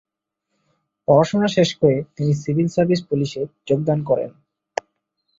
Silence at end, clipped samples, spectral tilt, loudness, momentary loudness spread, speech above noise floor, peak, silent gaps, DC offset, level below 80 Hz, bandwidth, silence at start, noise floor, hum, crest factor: 1.1 s; under 0.1%; -7 dB/octave; -20 LUFS; 14 LU; 59 dB; -2 dBFS; none; under 0.1%; -58 dBFS; 7.8 kHz; 1.1 s; -77 dBFS; none; 20 dB